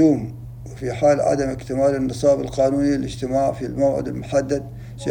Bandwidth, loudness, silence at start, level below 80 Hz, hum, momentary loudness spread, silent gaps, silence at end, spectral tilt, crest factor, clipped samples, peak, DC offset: 16 kHz; -21 LUFS; 0 s; -42 dBFS; none; 12 LU; none; 0 s; -7 dB/octave; 14 dB; under 0.1%; -6 dBFS; under 0.1%